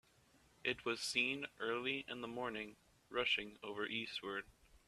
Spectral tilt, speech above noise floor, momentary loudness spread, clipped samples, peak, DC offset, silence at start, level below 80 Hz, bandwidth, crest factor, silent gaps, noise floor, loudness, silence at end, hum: -2.5 dB/octave; 29 dB; 11 LU; under 0.1%; -22 dBFS; under 0.1%; 0.65 s; -74 dBFS; 14.5 kHz; 22 dB; none; -71 dBFS; -41 LUFS; 0.1 s; none